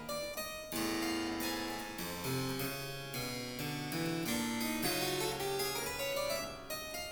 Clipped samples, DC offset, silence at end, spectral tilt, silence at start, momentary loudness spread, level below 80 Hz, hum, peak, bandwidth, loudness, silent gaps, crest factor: under 0.1%; under 0.1%; 0 s; -3.5 dB/octave; 0 s; 6 LU; -58 dBFS; none; -22 dBFS; over 20 kHz; -37 LUFS; none; 16 dB